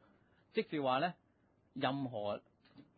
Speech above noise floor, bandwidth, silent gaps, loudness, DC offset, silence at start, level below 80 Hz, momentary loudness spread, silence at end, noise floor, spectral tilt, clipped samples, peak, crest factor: 36 dB; 4.8 kHz; none; -39 LUFS; under 0.1%; 0.55 s; -78 dBFS; 9 LU; 0.15 s; -73 dBFS; -4 dB/octave; under 0.1%; -20 dBFS; 20 dB